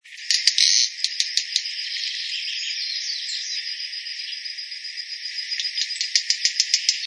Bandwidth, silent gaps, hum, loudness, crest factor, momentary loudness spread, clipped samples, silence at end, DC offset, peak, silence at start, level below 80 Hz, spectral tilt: 11 kHz; none; none; -22 LUFS; 26 dB; 13 LU; under 0.1%; 0 s; under 0.1%; 0 dBFS; 0.05 s; under -90 dBFS; 9.5 dB/octave